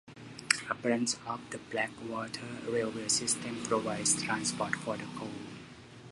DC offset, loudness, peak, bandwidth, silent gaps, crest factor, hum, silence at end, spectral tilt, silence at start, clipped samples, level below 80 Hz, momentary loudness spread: under 0.1%; -33 LUFS; -2 dBFS; 11.5 kHz; none; 34 dB; none; 0 s; -2.5 dB/octave; 0.05 s; under 0.1%; -68 dBFS; 16 LU